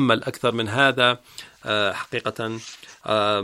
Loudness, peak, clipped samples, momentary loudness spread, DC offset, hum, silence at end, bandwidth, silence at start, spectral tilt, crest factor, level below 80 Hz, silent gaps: -22 LUFS; -2 dBFS; under 0.1%; 17 LU; under 0.1%; none; 0 s; 16 kHz; 0 s; -4.5 dB/octave; 22 dB; -64 dBFS; none